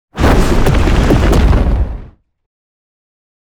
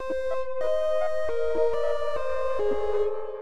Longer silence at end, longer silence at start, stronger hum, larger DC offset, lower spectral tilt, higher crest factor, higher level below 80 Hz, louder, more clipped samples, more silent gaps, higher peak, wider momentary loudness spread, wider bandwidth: first, 1.45 s vs 0 s; first, 0.15 s vs 0 s; neither; second, under 0.1% vs 5%; first, -6.5 dB/octave vs -5 dB/octave; about the same, 12 dB vs 12 dB; first, -14 dBFS vs -50 dBFS; first, -12 LUFS vs -28 LUFS; neither; neither; first, 0 dBFS vs -12 dBFS; first, 8 LU vs 4 LU; first, 17.5 kHz vs 12 kHz